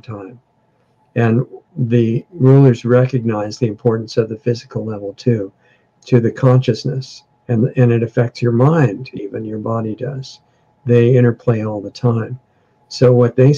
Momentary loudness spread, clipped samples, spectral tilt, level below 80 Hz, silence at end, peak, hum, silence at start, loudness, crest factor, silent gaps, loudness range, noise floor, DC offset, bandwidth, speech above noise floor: 15 LU; under 0.1%; -8.5 dB/octave; -56 dBFS; 0 s; 0 dBFS; none; 0.1 s; -16 LUFS; 14 dB; none; 3 LU; -59 dBFS; under 0.1%; 7.2 kHz; 44 dB